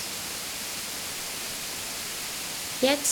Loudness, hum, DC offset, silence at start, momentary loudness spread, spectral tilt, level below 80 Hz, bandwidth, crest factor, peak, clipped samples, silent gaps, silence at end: -30 LUFS; none; under 0.1%; 0 s; 6 LU; -1 dB/octave; -60 dBFS; over 20 kHz; 22 dB; -10 dBFS; under 0.1%; none; 0 s